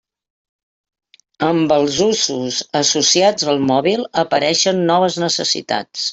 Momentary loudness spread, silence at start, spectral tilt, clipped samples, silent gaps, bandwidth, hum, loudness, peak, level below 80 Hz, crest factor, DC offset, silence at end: 7 LU; 1.4 s; -3 dB/octave; under 0.1%; none; 8.4 kHz; none; -16 LUFS; -2 dBFS; -58 dBFS; 16 dB; under 0.1%; 0 s